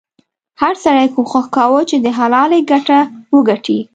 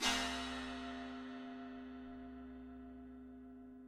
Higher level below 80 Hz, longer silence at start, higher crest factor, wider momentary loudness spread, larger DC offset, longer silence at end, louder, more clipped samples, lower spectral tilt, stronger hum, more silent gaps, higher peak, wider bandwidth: about the same, -58 dBFS vs -62 dBFS; first, 0.6 s vs 0 s; second, 12 dB vs 26 dB; second, 4 LU vs 15 LU; neither; about the same, 0.1 s vs 0 s; first, -13 LUFS vs -46 LUFS; neither; first, -5 dB/octave vs -2 dB/octave; neither; neither; first, 0 dBFS vs -20 dBFS; second, 8.6 kHz vs 16 kHz